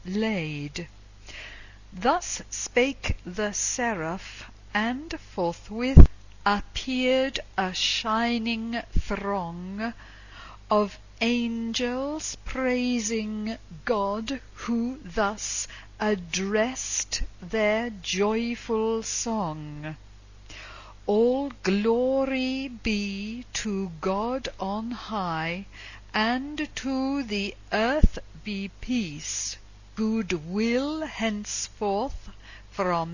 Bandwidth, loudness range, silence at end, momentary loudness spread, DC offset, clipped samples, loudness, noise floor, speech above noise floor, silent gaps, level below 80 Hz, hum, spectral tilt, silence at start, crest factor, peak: 7.4 kHz; 6 LU; 0 s; 14 LU; under 0.1%; under 0.1%; -27 LUFS; -47 dBFS; 21 dB; none; -34 dBFS; none; -4.5 dB/octave; 0.05 s; 26 dB; 0 dBFS